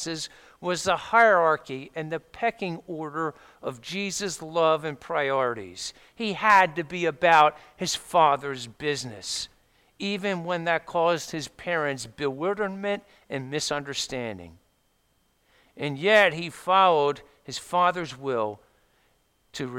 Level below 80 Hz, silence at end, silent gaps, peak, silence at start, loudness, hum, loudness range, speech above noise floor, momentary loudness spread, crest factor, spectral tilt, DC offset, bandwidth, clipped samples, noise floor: -64 dBFS; 0 s; none; -6 dBFS; 0 s; -25 LUFS; none; 7 LU; 43 dB; 17 LU; 20 dB; -3.5 dB/octave; under 0.1%; 16.5 kHz; under 0.1%; -68 dBFS